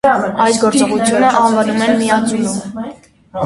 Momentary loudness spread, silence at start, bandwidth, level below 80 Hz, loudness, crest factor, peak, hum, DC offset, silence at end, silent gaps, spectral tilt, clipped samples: 15 LU; 0.05 s; 11.5 kHz; -50 dBFS; -13 LUFS; 14 dB; 0 dBFS; none; under 0.1%; 0 s; none; -4 dB/octave; under 0.1%